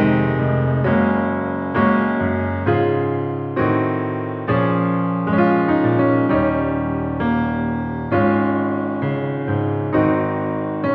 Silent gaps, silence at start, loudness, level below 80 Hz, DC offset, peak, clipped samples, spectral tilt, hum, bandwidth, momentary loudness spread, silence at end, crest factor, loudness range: none; 0 s; -19 LUFS; -42 dBFS; under 0.1%; -2 dBFS; under 0.1%; -11 dB/octave; none; 5.2 kHz; 6 LU; 0 s; 16 dB; 2 LU